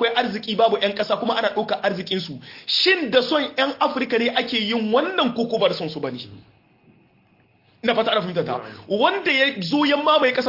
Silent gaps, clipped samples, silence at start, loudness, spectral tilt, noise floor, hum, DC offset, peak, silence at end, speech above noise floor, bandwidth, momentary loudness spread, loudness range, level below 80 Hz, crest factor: none; under 0.1%; 0 s; -21 LUFS; -5 dB/octave; -58 dBFS; none; under 0.1%; -4 dBFS; 0 s; 37 dB; 5.8 kHz; 10 LU; 5 LU; -66 dBFS; 18 dB